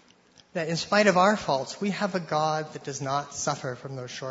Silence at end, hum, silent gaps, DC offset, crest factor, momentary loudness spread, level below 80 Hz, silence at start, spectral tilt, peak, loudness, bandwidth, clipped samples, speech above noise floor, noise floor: 0 s; none; none; under 0.1%; 22 dB; 14 LU; -66 dBFS; 0.55 s; -4 dB/octave; -6 dBFS; -27 LUFS; 8 kHz; under 0.1%; 32 dB; -58 dBFS